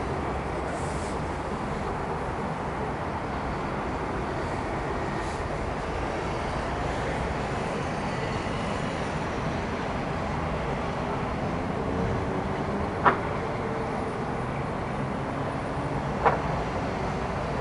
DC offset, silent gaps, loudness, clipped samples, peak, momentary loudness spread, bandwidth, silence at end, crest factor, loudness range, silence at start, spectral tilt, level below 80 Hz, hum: under 0.1%; none; -30 LUFS; under 0.1%; -4 dBFS; 3 LU; 11.5 kHz; 0 s; 24 dB; 3 LU; 0 s; -6.5 dB/octave; -40 dBFS; none